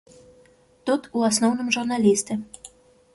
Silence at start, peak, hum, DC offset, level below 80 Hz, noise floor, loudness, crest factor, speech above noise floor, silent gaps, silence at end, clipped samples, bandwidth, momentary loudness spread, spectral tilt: 0.85 s; -6 dBFS; none; under 0.1%; -66 dBFS; -56 dBFS; -23 LUFS; 18 dB; 34 dB; none; 0.45 s; under 0.1%; 12 kHz; 13 LU; -3.5 dB/octave